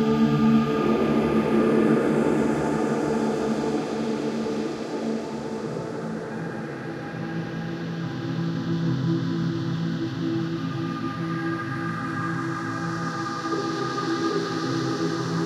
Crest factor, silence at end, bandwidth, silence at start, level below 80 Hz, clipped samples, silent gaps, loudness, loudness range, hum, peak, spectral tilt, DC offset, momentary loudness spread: 16 dB; 0 s; 12.5 kHz; 0 s; -54 dBFS; under 0.1%; none; -26 LUFS; 8 LU; none; -8 dBFS; -7 dB/octave; under 0.1%; 10 LU